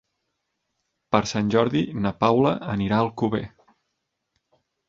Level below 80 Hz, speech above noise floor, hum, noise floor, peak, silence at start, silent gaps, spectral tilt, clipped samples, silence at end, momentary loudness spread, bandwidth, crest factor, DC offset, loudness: -54 dBFS; 56 dB; none; -78 dBFS; -2 dBFS; 1.1 s; none; -6.5 dB/octave; under 0.1%; 1.4 s; 6 LU; 7.6 kHz; 22 dB; under 0.1%; -23 LUFS